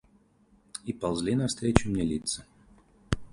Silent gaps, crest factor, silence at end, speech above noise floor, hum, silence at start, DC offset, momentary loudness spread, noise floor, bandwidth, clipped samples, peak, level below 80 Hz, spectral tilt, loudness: none; 30 dB; 0.05 s; 35 dB; none; 0.75 s; under 0.1%; 12 LU; -63 dBFS; 11.5 kHz; under 0.1%; 0 dBFS; -44 dBFS; -5 dB/octave; -30 LUFS